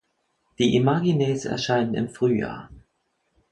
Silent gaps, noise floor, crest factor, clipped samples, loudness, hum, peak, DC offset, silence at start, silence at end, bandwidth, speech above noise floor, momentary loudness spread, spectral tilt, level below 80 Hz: none; -73 dBFS; 18 dB; under 0.1%; -23 LUFS; none; -6 dBFS; under 0.1%; 0.6 s; 0.75 s; 11 kHz; 50 dB; 6 LU; -6.5 dB/octave; -54 dBFS